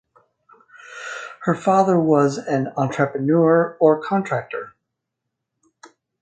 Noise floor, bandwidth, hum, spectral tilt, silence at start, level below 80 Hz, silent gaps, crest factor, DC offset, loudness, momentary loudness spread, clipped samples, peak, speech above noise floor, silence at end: -80 dBFS; 9 kHz; none; -7.5 dB/octave; 0.9 s; -68 dBFS; none; 18 dB; under 0.1%; -19 LUFS; 16 LU; under 0.1%; -2 dBFS; 62 dB; 1.55 s